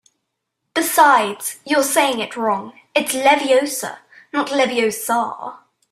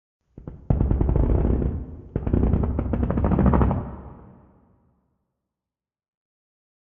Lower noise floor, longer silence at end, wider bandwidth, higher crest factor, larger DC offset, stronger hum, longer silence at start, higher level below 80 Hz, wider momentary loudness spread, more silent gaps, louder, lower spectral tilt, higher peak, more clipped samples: second, -76 dBFS vs -90 dBFS; second, 0.35 s vs 2.8 s; first, 16 kHz vs 3.3 kHz; about the same, 18 dB vs 20 dB; neither; neither; first, 0.75 s vs 0.35 s; second, -68 dBFS vs -28 dBFS; second, 13 LU vs 22 LU; neither; first, -18 LUFS vs -23 LUFS; second, -2 dB/octave vs -11 dB/octave; about the same, -2 dBFS vs -4 dBFS; neither